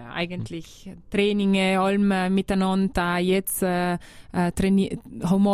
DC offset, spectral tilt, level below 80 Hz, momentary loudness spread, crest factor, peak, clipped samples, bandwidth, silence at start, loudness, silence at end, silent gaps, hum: under 0.1%; -6 dB/octave; -44 dBFS; 11 LU; 14 dB; -8 dBFS; under 0.1%; 15.5 kHz; 0 s; -23 LUFS; 0 s; none; none